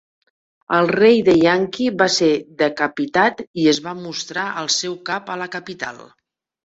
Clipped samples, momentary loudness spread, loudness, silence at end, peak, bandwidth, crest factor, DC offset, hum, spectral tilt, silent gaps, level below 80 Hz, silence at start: under 0.1%; 14 LU; -18 LUFS; 0.65 s; -2 dBFS; 8 kHz; 18 dB; under 0.1%; none; -4 dB/octave; 3.47-3.54 s; -58 dBFS; 0.7 s